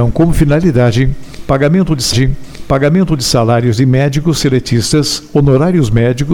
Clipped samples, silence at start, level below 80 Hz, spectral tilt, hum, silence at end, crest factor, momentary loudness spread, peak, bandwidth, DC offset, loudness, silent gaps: under 0.1%; 0 s; -24 dBFS; -6 dB/octave; none; 0 s; 10 dB; 5 LU; 0 dBFS; 17.5 kHz; under 0.1%; -11 LUFS; none